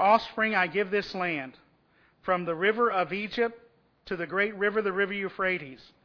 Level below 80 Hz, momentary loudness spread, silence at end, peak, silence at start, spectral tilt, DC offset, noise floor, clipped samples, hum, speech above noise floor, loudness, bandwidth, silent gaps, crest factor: -64 dBFS; 10 LU; 0.3 s; -10 dBFS; 0 s; -6.5 dB/octave; under 0.1%; -65 dBFS; under 0.1%; none; 37 dB; -28 LUFS; 5.4 kHz; none; 20 dB